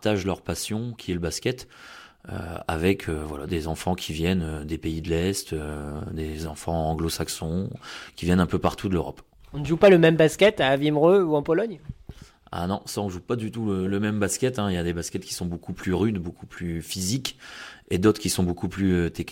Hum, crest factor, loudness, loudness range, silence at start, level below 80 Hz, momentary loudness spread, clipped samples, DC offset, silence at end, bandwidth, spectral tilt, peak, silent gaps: none; 18 dB; -25 LUFS; 9 LU; 0 s; -44 dBFS; 17 LU; under 0.1%; under 0.1%; 0 s; 16.5 kHz; -5.5 dB/octave; -6 dBFS; none